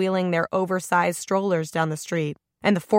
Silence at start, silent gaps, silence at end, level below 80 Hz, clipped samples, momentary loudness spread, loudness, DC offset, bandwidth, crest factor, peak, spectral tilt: 0 s; none; 0 s; -66 dBFS; under 0.1%; 5 LU; -24 LUFS; under 0.1%; 16.5 kHz; 18 dB; -6 dBFS; -5.5 dB/octave